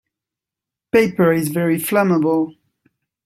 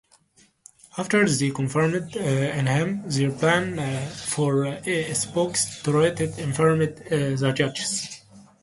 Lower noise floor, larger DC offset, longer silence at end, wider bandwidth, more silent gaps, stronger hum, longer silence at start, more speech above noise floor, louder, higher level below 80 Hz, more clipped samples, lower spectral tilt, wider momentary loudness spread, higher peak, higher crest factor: first, -86 dBFS vs -60 dBFS; neither; first, 0.75 s vs 0.2 s; first, 16 kHz vs 11.5 kHz; neither; neither; about the same, 0.95 s vs 0.95 s; first, 70 dB vs 37 dB; first, -17 LUFS vs -24 LUFS; about the same, -58 dBFS vs -58 dBFS; neither; first, -6.5 dB/octave vs -5 dB/octave; second, 4 LU vs 7 LU; first, -2 dBFS vs -6 dBFS; about the same, 18 dB vs 18 dB